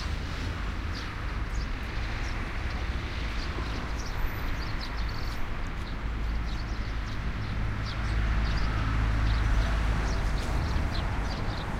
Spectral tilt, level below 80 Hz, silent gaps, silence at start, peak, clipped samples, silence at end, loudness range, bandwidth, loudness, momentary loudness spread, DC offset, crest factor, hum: -5.5 dB/octave; -30 dBFS; none; 0 s; -16 dBFS; under 0.1%; 0 s; 5 LU; 14.5 kHz; -32 LUFS; 6 LU; under 0.1%; 14 dB; none